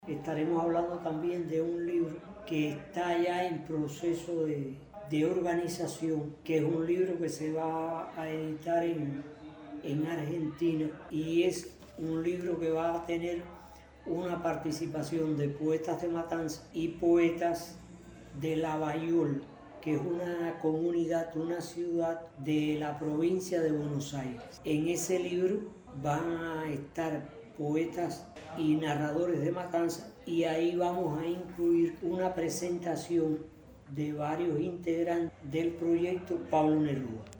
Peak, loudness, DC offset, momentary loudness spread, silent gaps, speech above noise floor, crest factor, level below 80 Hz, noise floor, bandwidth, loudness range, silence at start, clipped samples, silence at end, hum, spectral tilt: -16 dBFS; -33 LUFS; under 0.1%; 9 LU; none; 21 dB; 16 dB; -62 dBFS; -53 dBFS; over 20 kHz; 3 LU; 0 s; under 0.1%; 0 s; none; -6.5 dB/octave